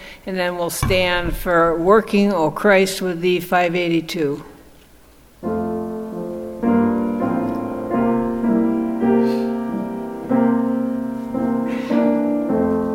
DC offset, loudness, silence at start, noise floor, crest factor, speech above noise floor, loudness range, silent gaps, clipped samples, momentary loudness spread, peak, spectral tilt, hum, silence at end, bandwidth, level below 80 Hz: under 0.1%; -19 LUFS; 0 s; -48 dBFS; 18 dB; 30 dB; 6 LU; none; under 0.1%; 10 LU; -2 dBFS; -5.5 dB/octave; none; 0 s; 17 kHz; -40 dBFS